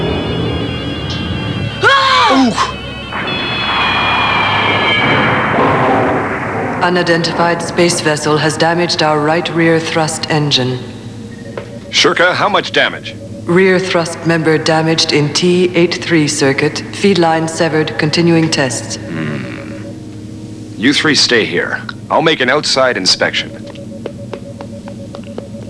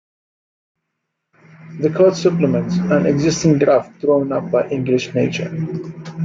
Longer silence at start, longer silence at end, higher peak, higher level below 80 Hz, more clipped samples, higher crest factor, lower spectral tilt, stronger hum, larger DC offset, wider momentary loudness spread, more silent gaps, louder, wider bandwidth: second, 0 s vs 1.6 s; about the same, 0 s vs 0 s; about the same, 0 dBFS vs -2 dBFS; first, -40 dBFS vs -52 dBFS; neither; about the same, 14 dB vs 16 dB; second, -4 dB/octave vs -6.5 dB/octave; neither; first, 0.2% vs under 0.1%; first, 17 LU vs 10 LU; neither; first, -12 LUFS vs -17 LUFS; first, 11 kHz vs 7.6 kHz